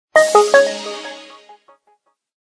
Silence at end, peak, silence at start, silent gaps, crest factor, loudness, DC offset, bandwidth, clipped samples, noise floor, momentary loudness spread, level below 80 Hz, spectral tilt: 1.35 s; 0 dBFS; 0.15 s; none; 18 dB; -13 LUFS; under 0.1%; 11 kHz; under 0.1%; -61 dBFS; 21 LU; -70 dBFS; -1 dB/octave